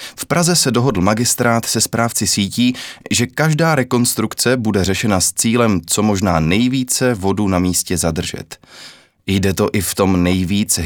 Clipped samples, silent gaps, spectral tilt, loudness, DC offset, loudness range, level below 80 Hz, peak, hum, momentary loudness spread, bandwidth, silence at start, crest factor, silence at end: under 0.1%; none; -4 dB/octave; -16 LUFS; under 0.1%; 3 LU; -42 dBFS; 0 dBFS; none; 5 LU; over 20 kHz; 0 s; 16 dB; 0 s